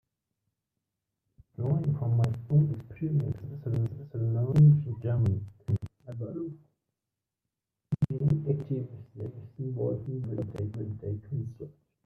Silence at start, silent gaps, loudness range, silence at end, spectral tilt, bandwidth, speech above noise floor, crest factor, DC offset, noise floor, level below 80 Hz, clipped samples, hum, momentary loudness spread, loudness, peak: 1.6 s; none; 8 LU; 0.35 s; -11 dB/octave; 3.2 kHz; 60 dB; 18 dB; under 0.1%; -88 dBFS; -58 dBFS; under 0.1%; none; 15 LU; -30 LUFS; -12 dBFS